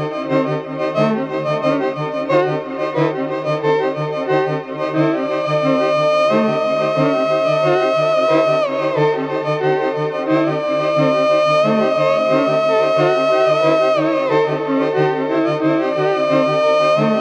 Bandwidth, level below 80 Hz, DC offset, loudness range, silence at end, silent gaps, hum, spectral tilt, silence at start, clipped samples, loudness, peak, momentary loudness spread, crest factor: 8.8 kHz; -64 dBFS; under 0.1%; 4 LU; 0 s; none; none; -6.5 dB/octave; 0 s; under 0.1%; -16 LUFS; -2 dBFS; 6 LU; 14 dB